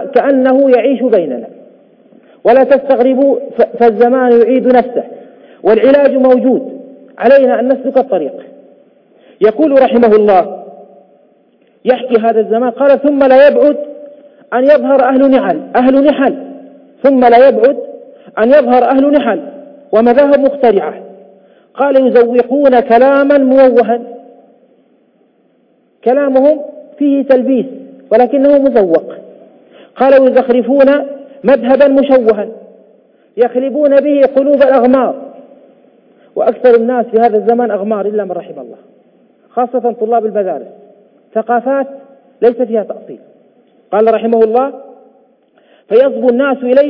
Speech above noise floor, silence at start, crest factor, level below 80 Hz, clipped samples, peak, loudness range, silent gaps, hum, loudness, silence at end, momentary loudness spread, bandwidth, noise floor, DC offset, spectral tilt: 44 dB; 0 s; 10 dB; -54 dBFS; under 0.1%; 0 dBFS; 6 LU; none; none; -10 LUFS; 0 s; 13 LU; 5.4 kHz; -53 dBFS; under 0.1%; -8.5 dB/octave